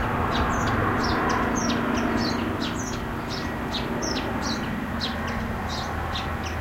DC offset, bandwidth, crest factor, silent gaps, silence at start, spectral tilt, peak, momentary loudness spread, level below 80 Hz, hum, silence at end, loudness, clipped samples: under 0.1%; 16 kHz; 14 dB; none; 0 s; -4.5 dB/octave; -12 dBFS; 6 LU; -38 dBFS; none; 0 s; -26 LUFS; under 0.1%